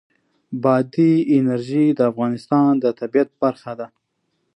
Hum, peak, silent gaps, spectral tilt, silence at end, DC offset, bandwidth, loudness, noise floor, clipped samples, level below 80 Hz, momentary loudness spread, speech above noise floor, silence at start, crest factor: none; -4 dBFS; none; -9 dB/octave; 0.7 s; under 0.1%; 9.2 kHz; -18 LUFS; -71 dBFS; under 0.1%; -70 dBFS; 15 LU; 53 dB; 0.5 s; 16 dB